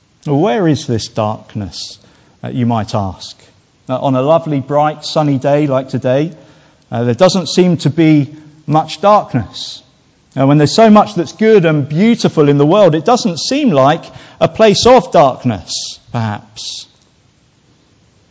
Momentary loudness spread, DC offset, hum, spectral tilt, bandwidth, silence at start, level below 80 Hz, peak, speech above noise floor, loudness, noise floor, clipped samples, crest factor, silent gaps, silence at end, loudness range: 15 LU; under 0.1%; none; -6 dB/octave; 8 kHz; 0.25 s; -46 dBFS; 0 dBFS; 40 dB; -12 LUFS; -52 dBFS; under 0.1%; 12 dB; none; 1.5 s; 7 LU